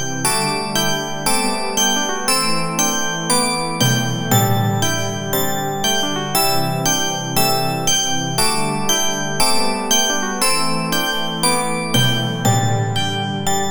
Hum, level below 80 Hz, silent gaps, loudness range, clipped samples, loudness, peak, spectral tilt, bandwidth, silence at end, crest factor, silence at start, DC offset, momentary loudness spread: none; -44 dBFS; none; 1 LU; under 0.1%; -17 LUFS; -2 dBFS; -3 dB/octave; over 20 kHz; 0 s; 16 dB; 0 s; under 0.1%; 4 LU